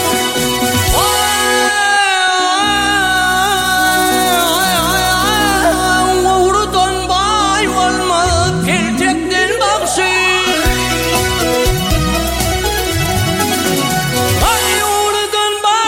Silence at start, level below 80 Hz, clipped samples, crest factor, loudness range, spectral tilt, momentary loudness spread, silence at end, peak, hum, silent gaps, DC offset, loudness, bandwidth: 0 s; -28 dBFS; under 0.1%; 12 dB; 2 LU; -3 dB/octave; 3 LU; 0 s; 0 dBFS; none; none; under 0.1%; -12 LUFS; 17 kHz